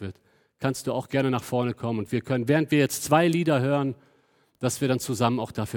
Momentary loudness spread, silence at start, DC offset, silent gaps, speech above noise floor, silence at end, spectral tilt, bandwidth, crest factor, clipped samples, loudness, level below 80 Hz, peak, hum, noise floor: 9 LU; 0 s; under 0.1%; none; 39 dB; 0 s; -5.5 dB/octave; 19.5 kHz; 20 dB; under 0.1%; -25 LUFS; -64 dBFS; -6 dBFS; none; -64 dBFS